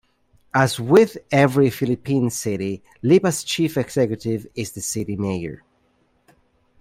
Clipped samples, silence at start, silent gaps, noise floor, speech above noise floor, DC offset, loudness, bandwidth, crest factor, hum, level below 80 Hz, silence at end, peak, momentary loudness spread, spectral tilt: under 0.1%; 0.55 s; none; -63 dBFS; 44 dB; under 0.1%; -20 LUFS; 16 kHz; 18 dB; none; -56 dBFS; 1.25 s; -2 dBFS; 11 LU; -5.5 dB/octave